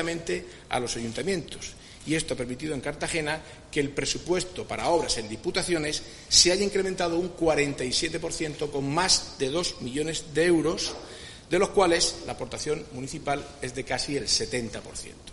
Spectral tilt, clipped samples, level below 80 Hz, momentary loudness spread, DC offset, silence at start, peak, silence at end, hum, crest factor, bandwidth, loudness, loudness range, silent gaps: -3 dB/octave; under 0.1%; -48 dBFS; 13 LU; under 0.1%; 0 s; -4 dBFS; 0 s; none; 24 dB; 11.5 kHz; -27 LUFS; 6 LU; none